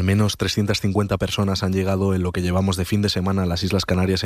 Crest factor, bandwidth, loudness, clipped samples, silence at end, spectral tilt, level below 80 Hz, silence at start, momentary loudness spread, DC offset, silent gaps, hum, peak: 14 dB; 15 kHz; -21 LUFS; under 0.1%; 0 s; -5.5 dB/octave; -40 dBFS; 0 s; 2 LU; under 0.1%; none; none; -6 dBFS